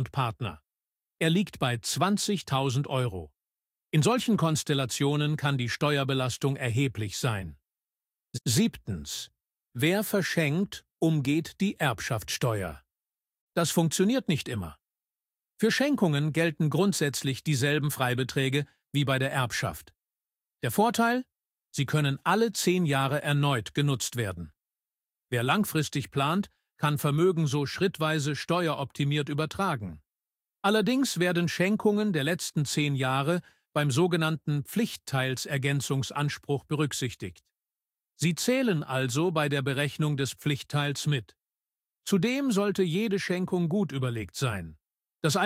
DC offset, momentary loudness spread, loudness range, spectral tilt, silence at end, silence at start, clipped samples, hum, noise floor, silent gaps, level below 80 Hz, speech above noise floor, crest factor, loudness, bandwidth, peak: under 0.1%; 8 LU; 3 LU; -5 dB/octave; 0 s; 0 s; under 0.1%; none; under -90 dBFS; 13.41-13.48 s; -60 dBFS; over 63 dB; 18 dB; -28 LUFS; 16 kHz; -10 dBFS